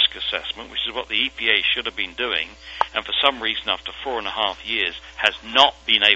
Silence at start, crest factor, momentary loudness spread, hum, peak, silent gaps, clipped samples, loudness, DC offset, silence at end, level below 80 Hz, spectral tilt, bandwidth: 0 s; 22 dB; 10 LU; none; 0 dBFS; none; under 0.1%; -21 LUFS; under 0.1%; 0 s; -50 dBFS; -2 dB/octave; 12 kHz